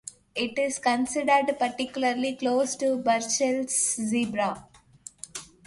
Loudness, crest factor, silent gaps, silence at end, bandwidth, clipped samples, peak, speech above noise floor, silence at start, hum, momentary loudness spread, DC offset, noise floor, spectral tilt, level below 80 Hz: -26 LUFS; 18 dB; none; 0.2 s; 11.5 kHz; under 0.1%; -8 dBFS; 24 dB; 0.05 s; none; 16 LU; under 0.1%; -50 dBFS; -2.5 dB/octave; -66 dBFS